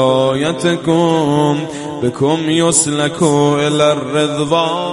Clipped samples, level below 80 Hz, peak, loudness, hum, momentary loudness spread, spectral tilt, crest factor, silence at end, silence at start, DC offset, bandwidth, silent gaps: under 0.1%; -50 dBFS; 0 dBFS; -14 LUFS; none; 5 LU; -4.5 dB/octave; 14 dB; 0 s; 0 s; under 0.1%; 11.5 kHz; none